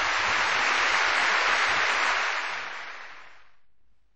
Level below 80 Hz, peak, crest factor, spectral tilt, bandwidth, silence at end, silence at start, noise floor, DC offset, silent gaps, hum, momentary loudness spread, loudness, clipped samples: -60 dBFS; -10 dBFS; 16 dB; 0 dB/octave; 8.2 kHz; 0 s; 0 s; -64 dBFS; 0.6%; none; none; 15 LU; -23 LUFS; under 0.1%